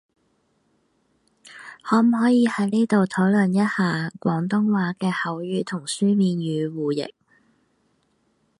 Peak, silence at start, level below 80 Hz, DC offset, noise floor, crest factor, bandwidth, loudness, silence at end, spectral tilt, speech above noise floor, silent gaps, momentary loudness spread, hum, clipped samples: -6 dBFS; 1.45 s; -68 dBFS; under 0.1%; -67 dBFS; 16 dB; 11.5 kHz; -22 LUFS; 1.5 s; -6.5 dB/octave; 46 dB; none; 9 LU; none; under 0.1%